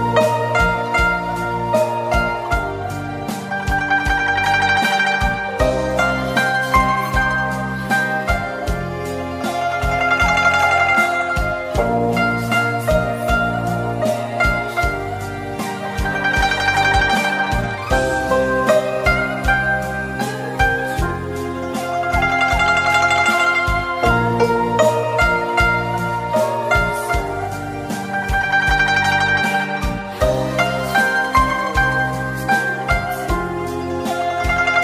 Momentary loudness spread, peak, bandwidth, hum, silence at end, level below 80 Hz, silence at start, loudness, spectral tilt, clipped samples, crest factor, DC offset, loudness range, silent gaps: 9 LU; -2 dBFS; 16 kHz; none; 0 s; -30 dBFS; 0 s; -18 LUFS; -5 dB/octave; under 0.1%; 16 dB; under 0.1%; 3 LU; none